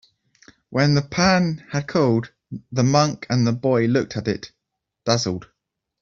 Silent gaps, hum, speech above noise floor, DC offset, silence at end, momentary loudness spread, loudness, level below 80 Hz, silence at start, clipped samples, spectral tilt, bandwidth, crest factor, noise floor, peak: none; none; 61 dB; under 0.1%; 0.6 s; 13 LU; -21 LUFS; -54 dBFS; 0.7 s; under 0.1%; -5.5 dB/octave; 7.6 kHz; 18 dB; -80 dBFS; -4 dBFS